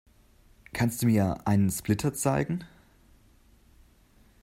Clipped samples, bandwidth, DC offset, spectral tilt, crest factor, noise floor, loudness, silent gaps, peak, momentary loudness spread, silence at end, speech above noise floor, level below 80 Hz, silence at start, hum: under 0.1%; 16 kHz; under 0.1%; -6 dB/octave; 18 dB; -60 dBFS; -27 LUFS; none; -12 dBFS; 8 LU; 1.75 s; 34 dB; -54 dBFS; 0.75 s; none